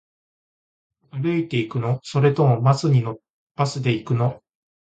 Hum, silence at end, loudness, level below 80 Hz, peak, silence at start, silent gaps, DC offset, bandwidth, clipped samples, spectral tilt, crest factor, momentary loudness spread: none; 0.5 s; -21 LUFS; -58 dBFS; -4 dBFS; 1.15 s; 3.30-3.55 s; under 0.1%; 8.8 kHz; under 0.1%; -7.5 dB/octave; 18 dB; 12 LU